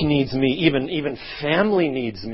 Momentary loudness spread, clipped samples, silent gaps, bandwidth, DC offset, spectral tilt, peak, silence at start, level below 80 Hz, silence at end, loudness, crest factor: 9 LU; under 0.1%; none; 5.8 kHz; under 0.1%; -10.5 dB/octave; -4 dBFS; 0 s; -46 dBFS; 0 s; -21 LUFS; 18 dB